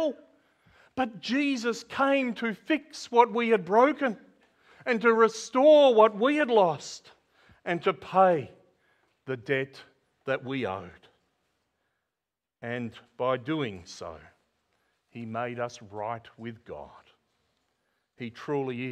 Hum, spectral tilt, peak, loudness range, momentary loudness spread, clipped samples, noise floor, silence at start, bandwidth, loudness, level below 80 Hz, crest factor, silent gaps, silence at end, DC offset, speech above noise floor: none; -5 dB/octave; -6 dBFS; 16 LU; 20 LU; under 0.1%; -88 dBFS; 0 s; 10 kHz; -26 LUFS; -70 dBFS; 22 dB; none; 0 s; under 0.1%; 62 dB